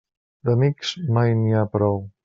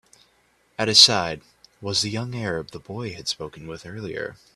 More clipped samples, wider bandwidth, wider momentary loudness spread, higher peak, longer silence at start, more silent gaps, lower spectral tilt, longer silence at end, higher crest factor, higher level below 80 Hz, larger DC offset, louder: neither; second, 7.6 kHz vs 15 kHz; second, 5 LU vs 24 LU; second, -6 dBFS vs 0 dBFS; second, 0.45 s vs 0.8 s; neither; first, -6.5 dB/octave vs -2 dB/octave; about the same, 0.15 s vs 0.2 s; second, 16 dB vs 24 dB; about the same, -58 dBFS vs -58 dBFS; neither; about the same, -21 LUFS vs -20 LUFS